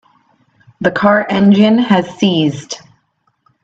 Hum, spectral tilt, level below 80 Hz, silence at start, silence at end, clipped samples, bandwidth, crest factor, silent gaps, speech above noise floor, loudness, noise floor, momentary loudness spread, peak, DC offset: none; -6 dB/octave; -54 dBFS; 0.8 s; 0.85 s; under 0.1%; 7.8 kHz; 14 dB; none; 51 dB; -12 LUFS; -62 dBFS; 15 LU; 0 dBFS; under 0.1%